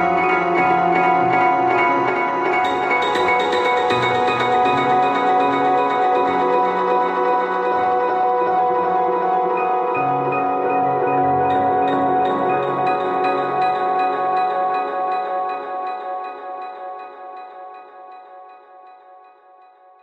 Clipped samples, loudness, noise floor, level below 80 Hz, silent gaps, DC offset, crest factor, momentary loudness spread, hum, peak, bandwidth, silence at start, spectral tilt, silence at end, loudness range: under 0.1%; -18 LUFS; -48 dBFS; -60 dBFS; none; under 0.1%; 14 dB; 10 LU; none; -4 dBFS; 8.6 kHz; 0 s; -6 dB/octave; 0.85 s; 12 LU